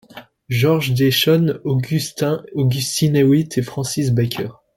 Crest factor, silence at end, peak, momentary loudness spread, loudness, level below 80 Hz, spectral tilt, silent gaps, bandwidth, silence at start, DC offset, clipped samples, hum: 14 dB; 0.25 s; -4 dBFS; 8 LU; -18 LUFS; -52 dBFS; -5.5 dB/octave; none; 17 kHz; 0.15 s; under 0.1%; under 0.1%; none